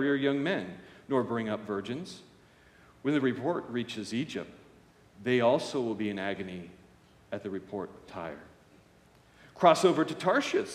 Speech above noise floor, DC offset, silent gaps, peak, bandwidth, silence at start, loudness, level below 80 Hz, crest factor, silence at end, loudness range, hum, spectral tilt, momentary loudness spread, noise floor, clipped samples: 31 dB; under 0.1%; none; -8 dBFS; 13.5 kHz; 0 s; -30 LUFS; -70 dBFS; 24 dB; 0 s; 8 LU; none; -5.5 dB/octave; 17 LU; -60 dBFS; under 0.1%